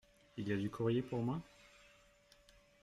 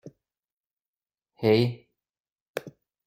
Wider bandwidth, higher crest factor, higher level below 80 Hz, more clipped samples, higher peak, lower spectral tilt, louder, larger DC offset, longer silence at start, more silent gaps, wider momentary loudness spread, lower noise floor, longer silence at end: second, 13 kHz vs 16 kHz; about the same, 18 dB vs 22 dB; about the same, -68 dBFS vs -66 dBFS; neither; second, -24 dBFS vs -8 dBFS; about the same, -8 dB/octave vs -7.5 dB/octave; second, -40 LUFS vs -25 LUFS; neither; first, 0.35 s vs 0.05 s; second, none vs 0.52-0.64 s, 0.88-0.93 s, 2.20-2.24 s, 2.32-2.36 s, 2.42-2.54 s; first, 24 LU vs 16 LU; second, -68 dBFS vs under -90 dBFS; first, 1.15 s vs 0.35 s